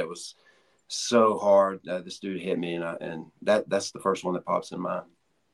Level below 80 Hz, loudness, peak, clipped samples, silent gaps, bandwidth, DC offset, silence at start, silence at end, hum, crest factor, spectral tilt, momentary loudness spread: -74 dBFS; -27 LUFS; -8 dBFS; under 0.1%; none; 12 kHz; under 0.1%; 0 s; 0.5 s; none; 20 dB; -4.5 dB/octave; 14 LU